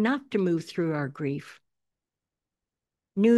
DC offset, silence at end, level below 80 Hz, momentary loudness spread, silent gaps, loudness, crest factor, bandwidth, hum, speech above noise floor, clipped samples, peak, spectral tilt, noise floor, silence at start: under 0.1%; 0 s; -78 dBFS; 11 LU; none; -29 LUFS; 18 dB; 12 kHz; none; 61 dB; under 0.1%; -10 dBFS; -7.5 dB/octave; -89 dBFS; 0 s